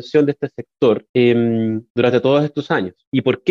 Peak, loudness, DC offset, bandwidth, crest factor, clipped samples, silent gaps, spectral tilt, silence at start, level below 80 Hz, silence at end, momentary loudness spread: -4 dBFS; -17 LUFS; under 0.1%; 7 kHz; 14 dB; under 0.1%; 1.09-1.14 s, 1.90-1.95 s, 3.07-3.12 s; -8 dB/octave; 0 s; -60 dBFS; 0 s; 7 LU